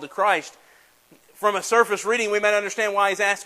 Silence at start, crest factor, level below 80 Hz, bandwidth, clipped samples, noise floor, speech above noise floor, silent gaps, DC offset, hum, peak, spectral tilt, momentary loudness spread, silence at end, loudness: 0 s; 18 dB; -76 dBFS; 15 kHz; under 0.1%; -55 dBFS; 34 dB; none; under 0.1%; none; -4 dBFS; -1.5 dB/octave; 5 LU; 0 s; -21 LUFS